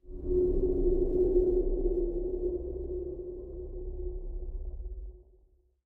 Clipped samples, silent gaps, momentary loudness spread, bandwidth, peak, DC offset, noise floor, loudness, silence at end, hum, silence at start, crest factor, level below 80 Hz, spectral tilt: under 0.1%; none; 16 LU; 1.2 kHz; -14 dBFS; under 0.1%; -65 dBFS; -32 LUFS; 0.65 s; none; 0.05 s; 16 dB; -36 dBFS; -13 dB/octave